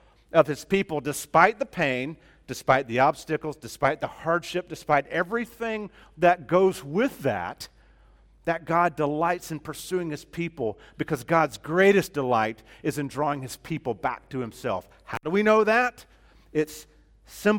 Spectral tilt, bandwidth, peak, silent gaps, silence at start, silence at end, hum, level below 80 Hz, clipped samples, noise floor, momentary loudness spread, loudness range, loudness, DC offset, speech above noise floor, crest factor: -5.5 dB/octave; 17.5 kHz; -2 dBFS; none; 0.35 s; 0 s; none; -56 dBFS; under 0.1%; -56 dBFS; 14 LU; 4 LU; -26 LUFS; under 0.1%; 31 dB; 24 dB